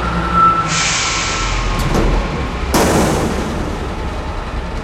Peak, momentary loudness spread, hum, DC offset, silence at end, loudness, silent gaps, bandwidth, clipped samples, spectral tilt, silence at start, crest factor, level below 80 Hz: -2 dBFS; 12 LU; none; under 0.1%; 0 s; -16 LUFS; none; 16.5 kHz; under 0.1%; -4 dB/octave; 0 s; 14 dB; -22 dBFS